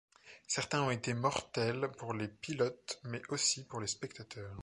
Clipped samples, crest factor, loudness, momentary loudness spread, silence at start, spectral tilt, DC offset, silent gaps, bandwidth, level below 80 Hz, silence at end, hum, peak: under 0.1%; 20 dB; -36 LUFS; 11 LU; 0.25 s; -3.5 dB/octave; under 0.1%; none; 11.5 kHz; -68 dBFS; 0 s; none; -18 dBFS